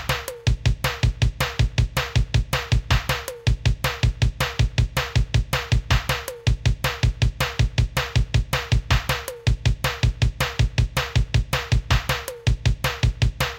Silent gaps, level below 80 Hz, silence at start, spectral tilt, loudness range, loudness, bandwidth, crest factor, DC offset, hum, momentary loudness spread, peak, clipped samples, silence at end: none; -26 dBFS; 0 s; -4.5 dB/octave; 0 LU; -23 LUFS; 17 kHz; 16 dB; under 0.1%; none; 3 LU; -6 dBFS; under 0.1%; 0 s